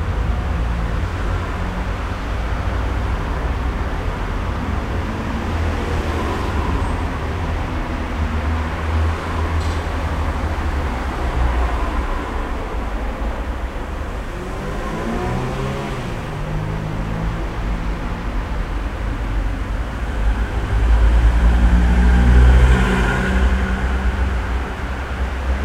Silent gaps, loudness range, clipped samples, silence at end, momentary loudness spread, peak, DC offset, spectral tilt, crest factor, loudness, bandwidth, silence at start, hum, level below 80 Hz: none; 9 LU; under 0.1%; 0 s; 10 LU; 0 dBFS; under 0.1%; -6.5 dB/octave; 18 dB; -21 LUFS; 10.5 kHz; 0 s; none; -20 dBFS